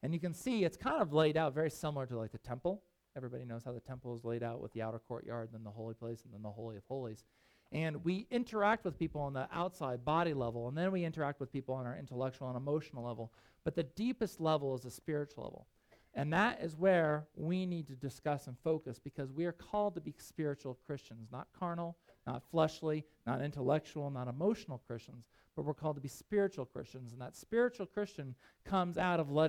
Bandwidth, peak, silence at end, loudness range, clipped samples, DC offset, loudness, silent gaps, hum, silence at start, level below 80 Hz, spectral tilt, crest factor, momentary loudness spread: 16 kHz; -18 dBFS; 0 s; 7 LU; under 0.1%; under 0.1%; -38 LUFS; none; none; 0.05 s; -66 dBFS; -7 dB/octave; 20 dB; 14 LU